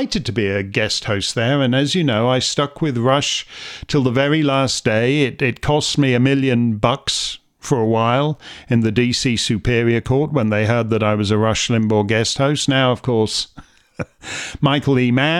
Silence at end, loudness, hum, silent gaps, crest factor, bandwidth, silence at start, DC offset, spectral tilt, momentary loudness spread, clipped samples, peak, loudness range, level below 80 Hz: 0 s; -17 LUFS; none; none; 16 dB; 12.5 kHz; 0 s; under 0.1%; -5 dB/octave; 6 LU; under 0.1%; -2 dBFS; 1 LU; -44 dBFS